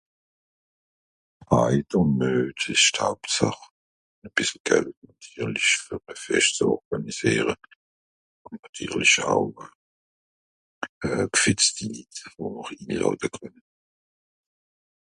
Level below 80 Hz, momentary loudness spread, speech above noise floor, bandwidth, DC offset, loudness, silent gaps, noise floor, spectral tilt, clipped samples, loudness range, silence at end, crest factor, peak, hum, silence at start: -54 dBFS; 18 LU; over 65 dB; 11.5 kHz; under 0.1%; -23 LUFS; 3.71-4.22 s, 4.60-4.65 s, 4.97-5.02 s, 6.85-6.91 s, 7.75-8.45 s, 8.69-8.73 s, 9.75-10.82 s, 10.89-11.01 s; under -90 dBFS; -3 dB/octave; under 0.1%; 3 LU; 1.55 s; 22 dB; -4 dBFS; none; 1.4 s